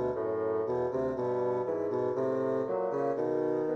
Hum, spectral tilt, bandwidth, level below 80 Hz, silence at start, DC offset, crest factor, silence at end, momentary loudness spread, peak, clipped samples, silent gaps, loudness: none; -9 dB/octave; 6.8 kHz; -64 dBFS; 0 s; under 0.1%; 10 dB; 0 s; 1 LU; -20 dBFS; under 0.1%; none; -31 LUFS